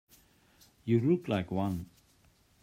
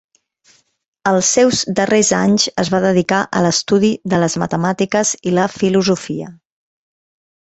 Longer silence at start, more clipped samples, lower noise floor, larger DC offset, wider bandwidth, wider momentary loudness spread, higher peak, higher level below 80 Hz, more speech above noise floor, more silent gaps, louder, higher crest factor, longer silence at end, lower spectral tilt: second, 0.85 s vs 1.05 s; neither; first, -66 dBFS vs -55 dBFS; neither; first, 16 kHz vs 8.4 kHz; first, 15 LU vs 5 LU; second, -16 dBFS vs -2 dBFS; second, -64 dBFS vs -52 dBFS; second, 36 dB vs 40 dB; neither; second, -31 LUFS vs -15 LUFS; about the same, 18 dB vs 16 dB; second, 0.75 s vs 1.25 s; first, -8.5 dB/octave vs -4 dB/octave